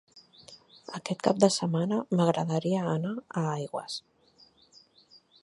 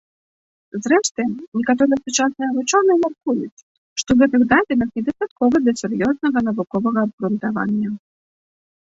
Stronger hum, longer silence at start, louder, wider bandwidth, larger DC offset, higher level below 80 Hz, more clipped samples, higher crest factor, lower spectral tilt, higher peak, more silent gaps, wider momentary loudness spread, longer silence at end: neither; second, 0.15 s vs 0.75 s; second, -29 LUFS vs -19 LUFS; first, 11.5 kHz vs 8 kHz; neither; second, -74 dBFS vs -54 dBFS; neither; first, 24 dB vs 16 dB; first, -6 dB/octave vs -4.5 dB/octave; second, -6 dBFS vs -2 dBFS; second, none vs 1.11-1.15 s, 1.48-1.52 s, 3.52-3.96 s, 5.31-5.36 s, 7.13-7.18 s; first, 15 LU vs 9 LU; first, 1.45 s vs 0.85 s